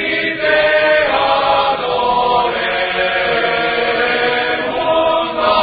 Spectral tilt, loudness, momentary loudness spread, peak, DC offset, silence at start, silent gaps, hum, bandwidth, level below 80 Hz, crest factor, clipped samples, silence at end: -9 dB/octave; -14 LUFS; 4 LU; -2 dBFS; under 0.1%; 0 s; none; none; 5 kHz; -44 dBFS; 12 dB; under 0.1%; 0 s